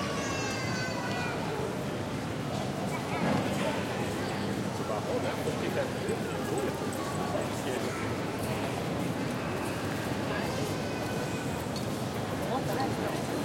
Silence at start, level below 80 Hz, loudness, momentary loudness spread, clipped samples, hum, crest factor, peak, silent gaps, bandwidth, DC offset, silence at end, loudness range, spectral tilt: 0 s; -56 dBFS; -32 LUFS; 3 LU; under 0.1%; none; 14 dB; -18 dBFS; none; 16.5 kHz; under 0.1%; 0 s; 1 LU; -5 dB/octave